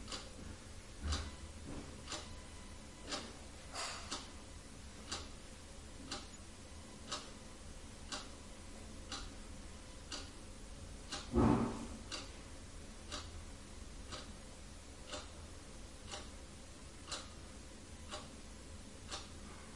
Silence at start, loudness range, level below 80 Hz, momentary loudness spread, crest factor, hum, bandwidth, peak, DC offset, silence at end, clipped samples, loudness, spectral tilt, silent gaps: 0 s; 10 LU; -54 dBFS; 11 LU; 28 dB; none; 11.5 kHz; -18 dBFS; under 0.1%; 0 s; under 0.1%; -46 LUFS; -4 dB/octave; none